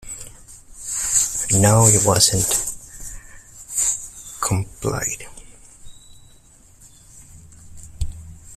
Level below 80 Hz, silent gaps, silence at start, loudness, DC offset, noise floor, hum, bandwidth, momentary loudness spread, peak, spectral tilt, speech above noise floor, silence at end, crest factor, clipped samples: -40 dBFS; none; 0 s; -18 LUFS; under 0.1%; -49 dBFS; none; 16 kHz; 23 LU; 0 dBFS; -3.5 dB/octave; 32 dB; 0 s; 22 dB; under 0.1%